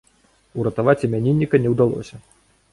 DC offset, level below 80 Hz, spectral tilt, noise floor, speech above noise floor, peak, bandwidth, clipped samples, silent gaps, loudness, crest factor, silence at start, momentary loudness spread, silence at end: under 0.1%; -52 dBFS; -9 dB/octave; -59 dBFS; 40 dB; -2 dBFS; 11.5 kHz; under 0.1%; none; -19 LUFS; 18 dB; 0.55 s; 14 LU; 0.55 s